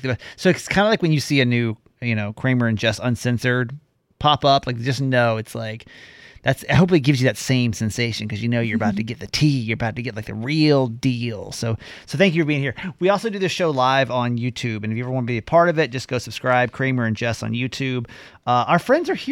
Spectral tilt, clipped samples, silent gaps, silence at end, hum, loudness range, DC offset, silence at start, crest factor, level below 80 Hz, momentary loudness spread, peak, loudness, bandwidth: -6 dB/octave; under 0.1%; none; 0 s; none; 2 LU; under 0.1%; 0 s; 18 dB; -50 dBFS; 10 LU; -2 dBFS; -21 LUFS; 16.5 kHz